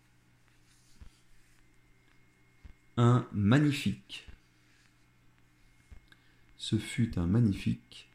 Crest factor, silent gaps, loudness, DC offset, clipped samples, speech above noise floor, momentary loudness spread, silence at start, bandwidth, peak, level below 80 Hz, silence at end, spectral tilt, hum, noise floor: 20 dB; none; -30 LUFS; under 0.1%; under 0.1%; 36 dB; 15 LU; 1 s; 12.5 kHz; -12 dBFS; -58 dBFS; 0.15 s; -7 dB/octave; none; -65 dBFS